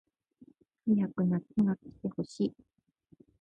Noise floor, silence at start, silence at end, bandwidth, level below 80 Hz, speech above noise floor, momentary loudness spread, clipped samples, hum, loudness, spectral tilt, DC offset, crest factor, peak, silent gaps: -64 dBFS; 0.85 s; 0.9 s; 8.8 kHz; -68 dBFS; 33 dB; 8 LU; under 0.1%; none; -32 LUFS; -9 dB/octave; under 0.1%; 16 dB; -16 dBFS; none